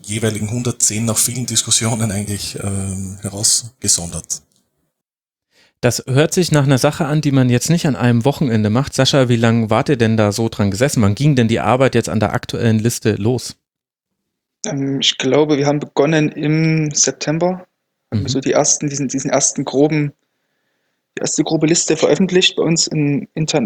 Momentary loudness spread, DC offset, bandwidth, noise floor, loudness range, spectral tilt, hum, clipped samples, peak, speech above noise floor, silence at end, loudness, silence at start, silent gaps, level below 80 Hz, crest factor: 9 LU; under 0.1%; 20 kHz; -84 dBFS; 4 LU; -4.5 dB/octave; none; under 0.1%; 0 dBFS; 68 dB; 0 s; -16 LUFS; 0.05 s; none; -50 dBFS; 16 dB